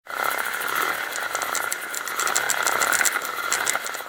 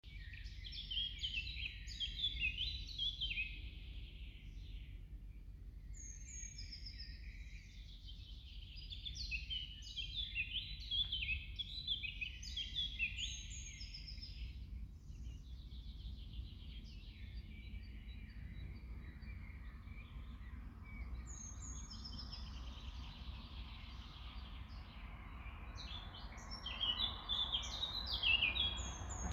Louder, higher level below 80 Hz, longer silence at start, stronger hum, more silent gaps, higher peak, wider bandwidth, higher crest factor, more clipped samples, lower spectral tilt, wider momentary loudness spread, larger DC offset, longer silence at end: first, -23 LUFS vs -44 LUFS; second, -66 dBFS vs -52 dBFS; about the same, 0.05 s vs 0.05 s; neither; neither; first, 0 dBFS vs -22 dBFS; first, 19 kHz vs 13 kHz; about the same, 26 dB vs 24 dB; neither; second, 1 dB/octave vs -2 dB/octave; second, 7 LU vs 16 LU; neither; about the same, 0 s vs 0 s